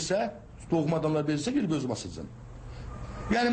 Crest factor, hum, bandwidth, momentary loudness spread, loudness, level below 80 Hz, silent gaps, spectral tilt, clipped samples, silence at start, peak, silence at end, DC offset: 14 dB; none; 8.8 kHz; 17 LU; -30 LUFS; -48 dBFS; none; -5.5 dB/octave; under 0.1%; 0 s; -16 dBFS; 0 s; under 0.1%